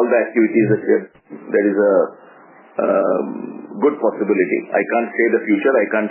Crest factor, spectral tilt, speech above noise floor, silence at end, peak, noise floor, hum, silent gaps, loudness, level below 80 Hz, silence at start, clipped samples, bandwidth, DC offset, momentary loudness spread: 14 dB; -11 dB/octave; 28 dB; 0 s; -2 dBFS; -45 dBFS; none; none; -17 LUFS; -76 dBFS; 0 s; under 0.1%; 3.2 kHz; under 0.1%; 11 LU